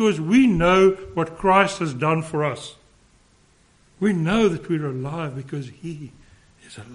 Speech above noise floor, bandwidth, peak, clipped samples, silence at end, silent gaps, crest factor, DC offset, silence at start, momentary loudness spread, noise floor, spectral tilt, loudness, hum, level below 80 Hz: 37 dB; 10.5 kHz; -2 dBFS; under 0.1%; 0 s; none; 20 dB; under 0.1%; 0 s; 19 LU; -57 dBFS; -6.5 dB/octave; -21 LUFS; none; -46 dBFS